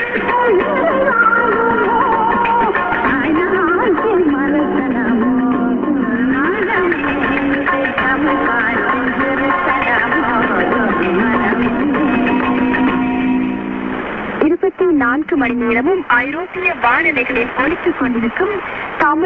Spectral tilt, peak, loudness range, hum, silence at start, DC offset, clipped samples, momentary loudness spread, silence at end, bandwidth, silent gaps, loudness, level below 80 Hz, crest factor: -8 dB/octave; 0 dBFS; 2 LU; none; 0 s; under 0.1%; under 0.1%; 4 LU; 0 s; 4.8 kHz; none; -15 LUFS; -42 dBFS; 14 dB